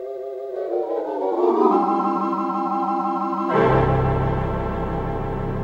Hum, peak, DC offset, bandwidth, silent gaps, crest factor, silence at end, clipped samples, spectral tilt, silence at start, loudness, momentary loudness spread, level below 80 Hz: none; -4 dBFS; under 0.1%; 7.2 kHz; none; 16 dB; 0 s; under 0.1%; -9.5 dB/octave; 0 s; -22 LUFS; 9 LU; -34 dBFS